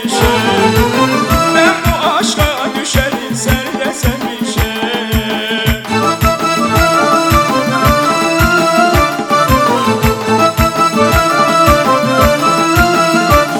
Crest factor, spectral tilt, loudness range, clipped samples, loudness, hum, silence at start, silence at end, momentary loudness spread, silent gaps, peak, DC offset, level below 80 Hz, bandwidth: 12 dB; -4.5 dB/octave; 4 LU; 0.1%; -11 LUFS; none; 0 s; 0 s; 6 LU; none; 0 dBFS; under 0.1%; -24 dBFS; over 20 kHz